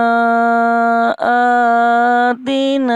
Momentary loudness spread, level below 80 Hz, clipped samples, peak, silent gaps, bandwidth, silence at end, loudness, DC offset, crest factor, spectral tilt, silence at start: 3 LU; -66 dBFS; under 0.1%; -4 dBFS; none; 9.8 kHz; 0 s; -13 LUFS; under 0.1%; 10 dB; -5 dB/octave; 0 s